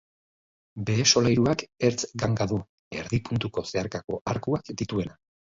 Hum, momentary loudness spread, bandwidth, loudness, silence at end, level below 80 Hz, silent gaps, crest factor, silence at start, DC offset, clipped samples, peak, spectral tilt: none; 13 LU; 7.8 kHz; -26 LUFS; 0.45 s; -50 dBFS; 2.69-2.91 s, 4.04-4.08 s, 4.21-4.25 s; 22 dB; 0.75 s; under 0.1%; under 0.1%; -6 dBFS; -4.5 dB/octave